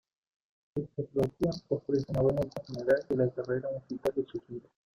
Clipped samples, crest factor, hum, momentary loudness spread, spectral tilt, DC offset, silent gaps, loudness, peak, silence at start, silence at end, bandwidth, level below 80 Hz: under 0.1%; 18 dB; none; 11 LU; -8 dB/octave; under 0.1%; none; -32 LUFS; -14 dBFS; 0.75 s; 0.4 s; 15.5 kHz; -58 dBFS